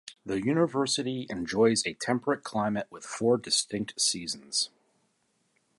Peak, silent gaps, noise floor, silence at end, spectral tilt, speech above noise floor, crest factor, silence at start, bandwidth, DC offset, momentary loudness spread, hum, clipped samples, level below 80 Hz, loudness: -10 dBFS; none; -73 dBFS; 1.1 s; -3.5 dB/octave; 45 dB; 18 dB; 0.05 s; 11.5 kHz; under 0.1%; 9 LU; none; under 0.1%; -66 dBFS; -28 LUFS